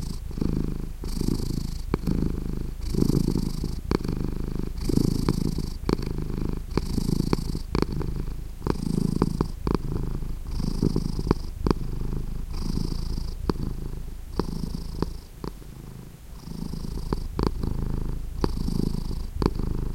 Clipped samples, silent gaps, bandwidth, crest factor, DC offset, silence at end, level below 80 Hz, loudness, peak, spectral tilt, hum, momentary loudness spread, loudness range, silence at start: under 0.1%; none; 16 kHz; 24 dB; under 0.1%; 0 s; -30 dBFS; -29 LUFS; -4 dBFS; -7 dB/octave; none; 9 LU; 6 LU; 0 s